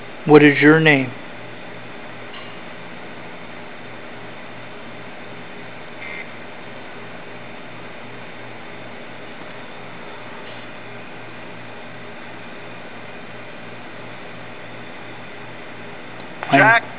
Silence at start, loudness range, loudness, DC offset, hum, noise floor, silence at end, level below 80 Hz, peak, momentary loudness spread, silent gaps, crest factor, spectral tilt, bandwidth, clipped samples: 0 s; 14 LU; -14 LUFS; 2%; none; -36 dBFS; 0 s; -62 dBFS; 0 dBFS; 22 LU; none; 22 dB; -9.5 dB/octave; 4 kHz; under 0.1%